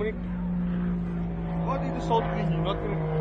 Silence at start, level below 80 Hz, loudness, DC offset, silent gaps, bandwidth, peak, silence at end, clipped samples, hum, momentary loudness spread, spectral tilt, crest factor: 0 s; -38 dBFS; -29 LUFS; under 0.1%; none; 7.6 kHz; -12 dBFS; 0 s; under 0.1%; none; 5 LU; -8.5 dB/octave; 16 dB